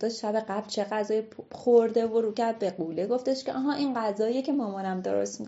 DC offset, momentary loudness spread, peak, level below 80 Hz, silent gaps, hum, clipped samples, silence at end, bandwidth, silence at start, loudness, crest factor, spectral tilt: under 0.1%; 9 LU; -10 dBFS; -78 dBFS; none; none; under 0.1%; 0 s; 8 kHz; 0 s; -28 LUFS; 18 dB; -4.5 dB/octave